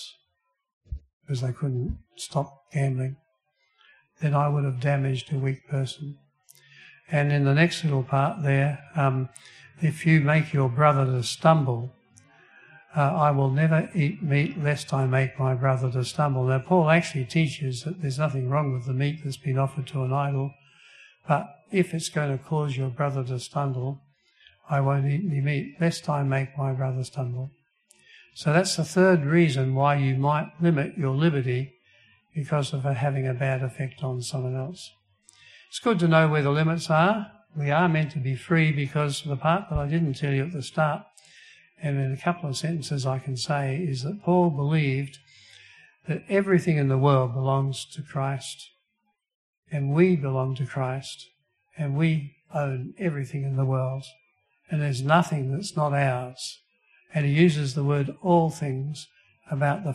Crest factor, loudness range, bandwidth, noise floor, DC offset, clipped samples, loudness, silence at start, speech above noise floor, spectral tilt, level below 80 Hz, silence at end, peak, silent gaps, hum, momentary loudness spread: 20 dB; 5 LU; 12 kHz; -77 dBFS; under 0.1%; under 0.1%; -25 LUFS; 0 s; 52 dB; -6.5 dB/octave; -54 dBFS; 0 s; -4 dBFS; 0.73-0.81 s, 1.13-1.21 s, 49.35-49.63 s; none; 12 LU